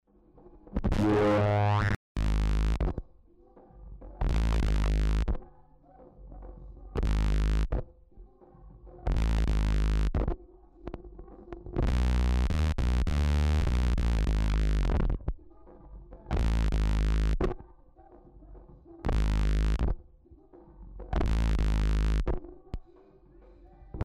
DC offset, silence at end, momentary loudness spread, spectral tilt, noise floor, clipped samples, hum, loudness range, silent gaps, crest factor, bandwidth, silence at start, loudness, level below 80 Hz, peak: under 0.1%; 0 s; 20 LU; -7 dB/octave; -57 dBFS; under 0.1%; none; 5 LU; 1.96-2.15 s; 10 dB; 9.2 kHz; 0.7 s; -30 LUFS; -30 dBFS; -18 dBFS